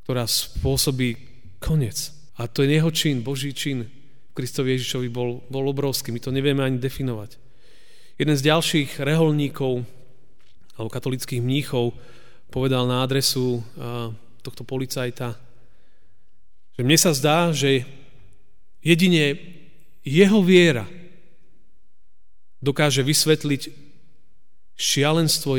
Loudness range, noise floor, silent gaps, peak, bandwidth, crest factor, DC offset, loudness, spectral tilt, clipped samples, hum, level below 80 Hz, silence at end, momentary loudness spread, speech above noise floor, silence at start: 6 LU; -67 dBFS; none; -4 dBFS; over 20 kHz; 20 dB; 2%; -21 LUFS; -4.5 dB/octave; under 0.1%; none; -46 dBFS; 0 s; 17 LU; 46 dB; 0.1 s